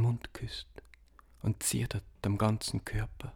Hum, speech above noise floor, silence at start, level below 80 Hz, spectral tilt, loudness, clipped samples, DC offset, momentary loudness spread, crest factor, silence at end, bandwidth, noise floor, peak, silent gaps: none; 26 dB; 0 s; -48 dBFS; -5 dB/octave; -34 LUFS; under 0.1%; under 0.1%; 11 LU; 18 dB; 0 s; 18 kHz; -59 dBFS; -16 dBFS; none